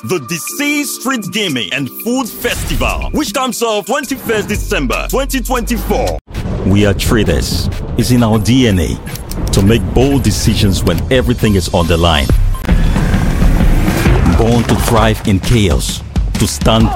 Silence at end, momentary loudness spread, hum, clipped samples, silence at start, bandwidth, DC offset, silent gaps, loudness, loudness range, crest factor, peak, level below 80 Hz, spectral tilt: 0 s; 6 LU; none; under 0.1%; 0.05 s; 16.5 kHz; under 0.1%; 6.21-6.25 s; -13 LUFS; 4 LU; 12 dB; 0 dBFS; -18 dBFS; -5 dB/octave